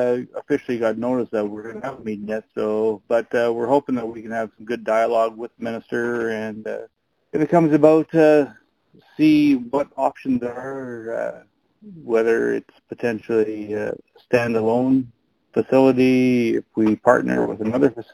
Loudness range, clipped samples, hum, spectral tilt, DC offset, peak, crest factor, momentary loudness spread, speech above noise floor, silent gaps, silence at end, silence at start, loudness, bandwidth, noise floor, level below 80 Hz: 6 LU; under 0.1%; none; -7.5 dB/octave; under 0.1%; 0 dBFS; 20 dB; 14 LU; 36 dB; none; 0.1 s; 0 s; -21 LUFS; 14 kHz; -56 dBFS; -60 dBFS